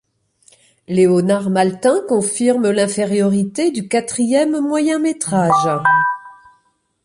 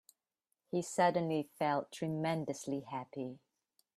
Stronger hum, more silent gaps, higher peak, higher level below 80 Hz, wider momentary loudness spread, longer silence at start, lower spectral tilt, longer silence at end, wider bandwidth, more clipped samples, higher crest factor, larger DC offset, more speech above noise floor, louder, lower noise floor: neither; neither; first, -2 dBFS vs -18 dBFS; first, -60 dBFS vs -80 dBFS; second, 5 LU vs 12 LU; first, 0.9 s vs 0.75 s; about the same, -5 dB/octave vs -5.5 dB/octave; about the same, 0.7 s vs 0.6 s; second, 11.5 kHz vs 14 kHz; neither; second, 14 dB vs 20 dB; neither; second, 46 dB vs 51 dB; first, -16 LUFS vs -37 LUFS; second, -61 dBFS vs -87 dBFS